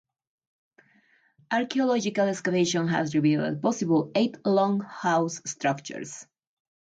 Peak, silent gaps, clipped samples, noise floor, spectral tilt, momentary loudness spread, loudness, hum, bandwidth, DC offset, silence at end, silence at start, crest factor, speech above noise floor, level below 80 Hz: -12 dBFS; none; under 0.1%; -64 dBFS; -5 dB/octave; 7 LU; -26 LUFS; none; 9.4 kHz; under 0.1%; 0.7 s; 1.5 s; 16 dB; 38 dB; -72 dBFS